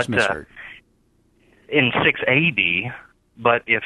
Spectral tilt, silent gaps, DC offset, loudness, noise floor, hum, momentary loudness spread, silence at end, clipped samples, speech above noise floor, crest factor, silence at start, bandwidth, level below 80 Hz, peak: -5 dB/octave; none; under 0.1%; -19 LUFS; -61 dBFS; 60 Hz at -50 dBFS; 22 LU; 0 s; under 0.1%; 42 dB; 20 dB; 0 s; 12 kHz; -54 dBFS; -2 dBFS